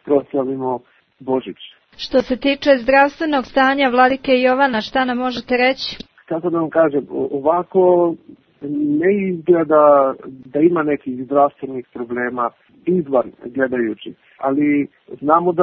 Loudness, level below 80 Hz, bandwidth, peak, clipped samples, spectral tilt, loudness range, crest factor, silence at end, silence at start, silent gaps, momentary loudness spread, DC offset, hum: -17 LUFS; -52 dBFS; 6.4 kHz; 0 dBFS; under 0.1%; -7 dB/octave; 5 LU; 18 dB; 0 s; 0.05 s; none; 14 LU; under 0.1%; none